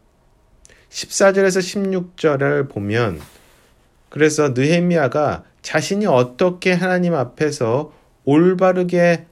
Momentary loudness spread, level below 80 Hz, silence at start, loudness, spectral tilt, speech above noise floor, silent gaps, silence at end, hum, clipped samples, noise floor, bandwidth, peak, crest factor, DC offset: 9 LU; -54 dBFS; 0.95 s; -17 LUFS; -5.5 dB/octave; 39 dB; none; 0.1 s; none; under 0.1%; -55 dBFS; 14 kHz; -2 dBFS; 16 dB; under 0.1%